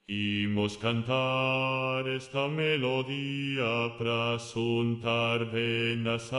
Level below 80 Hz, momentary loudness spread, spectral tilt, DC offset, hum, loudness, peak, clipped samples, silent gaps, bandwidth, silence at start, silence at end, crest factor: -66 dBFS; 4 LU; -6 dB/octave; under 0.1%; none; -29 LUFS; -14 dBFS; under 0.1%; none; 11.5 kHz; 0.1 s; 0 s; 16 dB